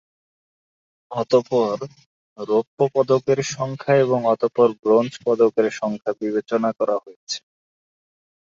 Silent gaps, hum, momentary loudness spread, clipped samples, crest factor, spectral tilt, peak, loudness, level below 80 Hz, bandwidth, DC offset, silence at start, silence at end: 2.06-2.36 s, 2.67-2.77 s, 4.79-4.83 s, 7.16-7.27 s; none; 12 LU; under 0.1%; 18 dB; -5.5 dB/octave; -4 dBFS; -21 LUFS; -66 dBFS; 7.6 kHz; under 0.1%; 1.1 s; 1.1 s